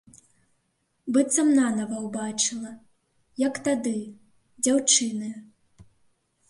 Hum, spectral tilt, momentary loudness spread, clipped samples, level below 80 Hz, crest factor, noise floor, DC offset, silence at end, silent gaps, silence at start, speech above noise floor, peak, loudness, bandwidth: none; -2.5 dB/octave; 20 LU; under 0.1%; -70 dBFS; 20 dB; -73 dBFS; under 0.1%; 0.65 s; none; 1.05 s; 49 dB; -6 dBFS; -24 LUFS; 11.5 kHz